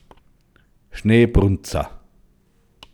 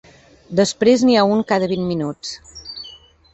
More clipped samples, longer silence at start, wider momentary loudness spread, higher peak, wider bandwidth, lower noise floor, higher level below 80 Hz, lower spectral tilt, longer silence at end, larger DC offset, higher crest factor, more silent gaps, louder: neither; first, 0.95 s vs 0.5 s; second, 16 LU vs 19 LU; about the same, -2 dBFS vs -2 dBFS; first, 19.5 kHz vs 8.4 kHz; first, -58 dBFS vs -43 dBFS; first, -32 dBFS vs -52 dBFS; first, -7 dB/octave vs -5 dB/octave; first, 1 s vs 0.4 s; neither; about the same, 20 dB vs 16 dB; neither; about the same, -18 LUFS vs -17 LUFS